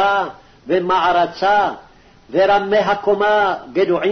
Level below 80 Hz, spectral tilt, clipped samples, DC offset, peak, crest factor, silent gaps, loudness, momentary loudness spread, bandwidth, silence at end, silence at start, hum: -50 dBFS; -5.5 dB/octave; under 0.1%; 0.3%; -6 dBFS; 12 dB; none; -17 LUFS; 7 LU; 6.4 kHz; 0 s; 0 s; none